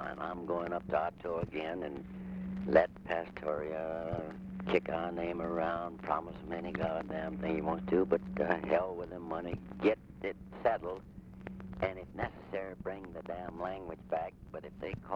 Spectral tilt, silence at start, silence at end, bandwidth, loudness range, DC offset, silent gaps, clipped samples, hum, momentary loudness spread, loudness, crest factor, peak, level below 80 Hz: -8.5 dB/octave; 0 s; 0 s; 7.4 kHz; 6 LU; under 0.1%; none; under 0.1%; none; 12 LU; -36 LUFS; 24 dB; -12 dBFS; -56 dBFS